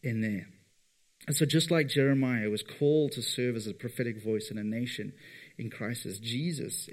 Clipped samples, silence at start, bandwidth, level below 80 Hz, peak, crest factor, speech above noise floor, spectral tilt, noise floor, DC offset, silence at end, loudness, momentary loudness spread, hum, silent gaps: under 0.1%; 0.05 s; 16 kHz; -76 dBFS; -12 dBFS; 18 dB; 38 dB; -5 dB/octave; -68 dBFS; under 0.1%; 0 s; -31 LUFS; 13 LU; none; none